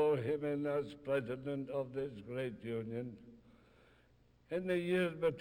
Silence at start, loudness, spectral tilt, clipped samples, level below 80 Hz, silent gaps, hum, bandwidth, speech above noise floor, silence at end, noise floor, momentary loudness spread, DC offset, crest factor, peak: 0 s; -39 LUFS; -7.5 dB/octave; under 0.1%; -70 dBFS; none; none; 16 kHz; 30 dB; 0 s; -68 dBFS; 9 LU; under 0.1%; 16 dB; -22 dBFS